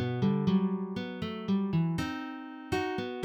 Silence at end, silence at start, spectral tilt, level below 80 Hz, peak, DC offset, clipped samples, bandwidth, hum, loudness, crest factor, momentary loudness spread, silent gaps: 0 s; 0 s; -7.5 dB/octave; -58 dBFS; -18 dBFS; under 0.1%; under 0.1%; 10.5 kHz; none; -32 LUFS; 14 dB; 9 LU; none